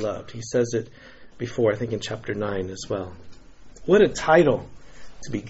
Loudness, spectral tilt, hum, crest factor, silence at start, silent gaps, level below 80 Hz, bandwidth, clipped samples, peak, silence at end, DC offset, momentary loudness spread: -23 LUFS; -5 dB/octave; none; 22 dB; 0 s; none; -50 dBFS; 8 kHz; under 0.1%; -4 dBFS; 0 s; under 0.1%; 17 LU